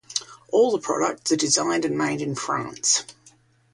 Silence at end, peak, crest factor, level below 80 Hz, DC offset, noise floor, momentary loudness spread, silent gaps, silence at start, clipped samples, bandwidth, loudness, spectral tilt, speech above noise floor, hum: 0.65 s; -4 dBFS; 20 dB; -66 dBFS; under 0.1%; -56 dBFS; 8 LU; none; 0.1 s; under 0.1%; 11.5 kHz; -23 LUFS; -2.5 dB/octave; 34 dB; none